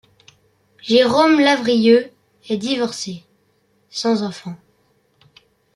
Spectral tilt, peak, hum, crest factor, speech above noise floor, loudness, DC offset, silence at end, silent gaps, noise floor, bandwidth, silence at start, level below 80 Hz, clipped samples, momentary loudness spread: -4.5 dB/octave; -2 dBFS; none; 18 dB; 45 dB; -17 LUFS; under 0.1%; 1.2 s; none; -62 dBFS; 12 kHz; 0.85 s; -64 dBFS; under 0.1%; 21 LU